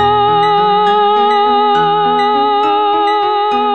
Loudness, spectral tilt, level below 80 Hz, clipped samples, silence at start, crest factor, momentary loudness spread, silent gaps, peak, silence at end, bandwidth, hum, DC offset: -11 LUFS; -6 dB/octave; -50 dBFS; under 0.1%; 0 s; 10 dB; 2 LU; none; -2 dBFS; 0 s; 7.8 kHz; none; 0.6%